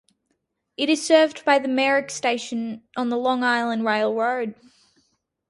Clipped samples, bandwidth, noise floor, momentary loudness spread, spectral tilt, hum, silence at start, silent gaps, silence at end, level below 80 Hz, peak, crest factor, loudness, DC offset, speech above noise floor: under 0.1%; 11.5 kHz; -74 dBFS; 11 LU; -3 dB/octave; none; 0.8 s; none; 0.95 s; -72 dBFS; -4 dBFS; 18 dB; -22 LUFS; under 0.1%; 53 dB